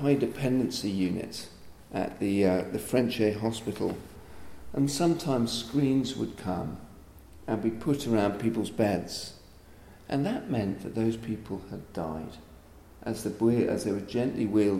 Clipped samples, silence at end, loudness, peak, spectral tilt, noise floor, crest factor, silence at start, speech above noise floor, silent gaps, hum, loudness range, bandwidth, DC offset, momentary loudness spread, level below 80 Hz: under 0.1%; 0 s; -30 LUFS; -12 dBFS; -6 dB/octave; -51 dBFS; 18 dB; 0 s; 23 dB; none; none; 5 LU; 16 kHz; under 0.1%; 14 LU; -54 dBFS